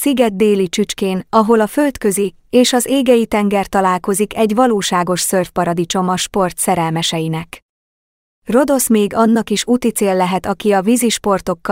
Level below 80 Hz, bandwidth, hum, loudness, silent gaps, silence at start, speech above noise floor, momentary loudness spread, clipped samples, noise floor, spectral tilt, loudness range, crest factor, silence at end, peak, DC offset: -46 dBFS; 16.5 kHz; none; -15 LUFS; 7.62-8.42 s; 0 s; over 75 dB; 5 LU; under 0.1%; under -90 dBFS; -4.5 dB/octave; 3 LU; 14 dB; 0 s; 0 dBFS; under 0.1%